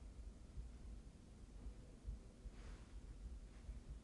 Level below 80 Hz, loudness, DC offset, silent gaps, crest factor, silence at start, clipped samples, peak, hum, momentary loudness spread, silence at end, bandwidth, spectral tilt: -56 dBFS; -59 LUFS; under 0.1%; none; 16 dB; 0 s; under 0.1%; -38 dBFS; none; 4 LU; 0 s; 11 kHz; -6 dB/octave